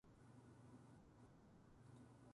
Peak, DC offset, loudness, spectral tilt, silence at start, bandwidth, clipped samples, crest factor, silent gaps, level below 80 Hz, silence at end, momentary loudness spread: -52 dBFS; under 0.1%; -67 LUFS; -7 dB/octave; 0.05 s; 11 kHz; under 0.1%; 14 dB; none; -78 dBFS; 0 s; 3 LU